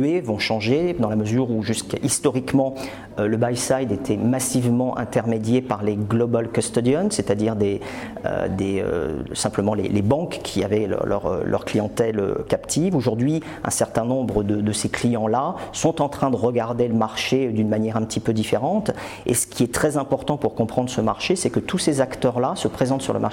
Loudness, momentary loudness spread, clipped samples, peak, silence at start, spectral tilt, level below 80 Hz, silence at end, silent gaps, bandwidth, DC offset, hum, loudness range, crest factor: -22 LUFS; 4 LU; under 0.1%; -6 dBFS; 0 s; -5.5 dB/octave; -48 dBFS; 0 s; none; 17 kHz; under 0.1%; none; 1 LU; 16 dB